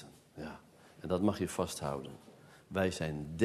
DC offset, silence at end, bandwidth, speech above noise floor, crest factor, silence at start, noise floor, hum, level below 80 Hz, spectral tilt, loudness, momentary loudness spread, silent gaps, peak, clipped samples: under 0.1%; 0 s; 13.5 kHz; 23 dB; 22 dB; 0 s; -57 dBFS; none; -60 dBFS; -5.5 dB/octave; -36 LUFS; 21 LU; none; -14 dBFS; under 0.1%